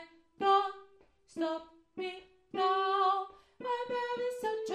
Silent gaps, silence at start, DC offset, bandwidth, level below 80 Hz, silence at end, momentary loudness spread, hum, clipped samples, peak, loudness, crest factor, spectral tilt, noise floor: none; 0 s; under 0.1%; 13 kHz; -76 dBFS; 0 s; 18 LU; none; under 0.1%; -16 dBFS; -33 LUFS; 18 dB; -3.5 dB/octave; -63 dBFS